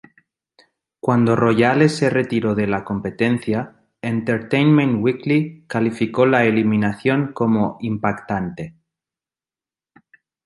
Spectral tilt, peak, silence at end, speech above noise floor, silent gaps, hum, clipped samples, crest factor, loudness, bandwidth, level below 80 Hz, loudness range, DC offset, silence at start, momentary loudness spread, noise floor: -7.5 dB/octave; -2 dBFS; 1.75 s; over 72 dB; none; none; under 0.1%; 18 dB; -19 LUFS; 11.5 kHz; -54 dBFS; 4 LU; under 0.1%; 1.05 s; 10 LU; under -90 dBFS